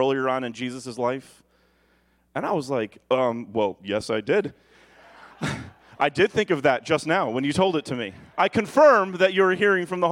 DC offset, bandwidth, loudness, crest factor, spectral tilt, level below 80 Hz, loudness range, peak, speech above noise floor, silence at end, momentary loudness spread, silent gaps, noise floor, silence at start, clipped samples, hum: under 0.1%; 12.5 kHz; -23 LUFS; 18 dB; -5.5 dB/octave; -60 dBFS; 7 LU; -4 dBFS; 41 dB; 0 s; 12 LU; none; -64 dBFS; 0 s; under 0.1%; none